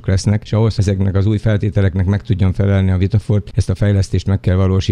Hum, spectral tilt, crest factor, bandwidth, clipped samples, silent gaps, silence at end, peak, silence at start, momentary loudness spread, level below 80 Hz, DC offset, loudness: none; -7.5 dB/octave; 14 dB; 10 kHz; under 0.1%; none; 0 s; -2 dBFS; 0.05 s; 2 LU; -32 dBFS; under 0.1%; -16 LUFS